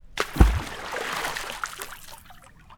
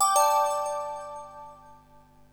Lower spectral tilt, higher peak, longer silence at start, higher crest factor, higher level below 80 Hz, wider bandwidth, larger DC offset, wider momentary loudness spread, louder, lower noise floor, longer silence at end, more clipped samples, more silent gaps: first, -4.5 dB/octave vs 0.5 dB/octave; first, 0 dBFS vs -10 dBFS; about the same, 0.05 s vs 0 s; first, 26 dB vs 18 dB; first, -28 dBFS vs -64 dBFS; about the same, 19 kHz vs over 20 kHz; neither; second, 20 LU vs 24 LU; about the same, -27 LUFS vs -26 LUFS; second, -49 dBFS vs -55 dBFS; second, 0.05 s vs 0.6 s; neither; neither